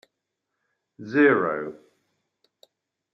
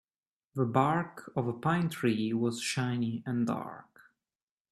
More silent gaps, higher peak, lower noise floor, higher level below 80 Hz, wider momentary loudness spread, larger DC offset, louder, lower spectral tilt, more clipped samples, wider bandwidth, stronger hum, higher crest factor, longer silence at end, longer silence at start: neither; first, -6 dBFS vs -10 dBFS; second, -82 dBFS vs under -90 dBFS; second, -76 dBFS vs -70 dBFS; first, 19 LU vs 9 LU; neither; first, -22 LUFS vs -31 LUFS; first, -8 dB/octave vs -6 dB/octave; neither; second, 6.2 kHz vs 13.5 kHz; neither; about the same, 20 dB vs 22 dB; first, 1.4 s vs 0.9 s; first, 1 s vs 0.55 s